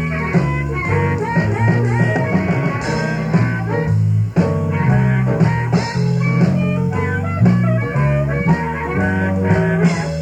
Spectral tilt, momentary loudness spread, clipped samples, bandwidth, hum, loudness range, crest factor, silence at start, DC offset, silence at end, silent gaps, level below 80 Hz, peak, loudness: -8 dB/octave; 4 LU; under 0.1%; 9.2 kHz; none; 1 LU; 14 dB; 0 s; under 0.1%; 0 s; none; -36 dBFS; 0 dBFS; -17 LUFS